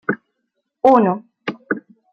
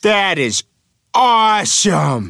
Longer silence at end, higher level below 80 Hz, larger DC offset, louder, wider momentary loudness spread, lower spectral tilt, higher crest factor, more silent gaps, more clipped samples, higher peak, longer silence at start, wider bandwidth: first, 0.35 s vs 0 s; second, -62 dBFS vs -56 dBFS; neither; second, -18 LUFS vs -14 LUFS; first, 16 LU vs 7 LU; first, -8 dB/octave vs -3 dB/octave; first, 18 dB vs 12 dB; neither; neither; about the same, -2 dBFS vs -2 dBFS; about the same, 0.1 s vs 0.05 s; second, 7 kHz vs 14 kHz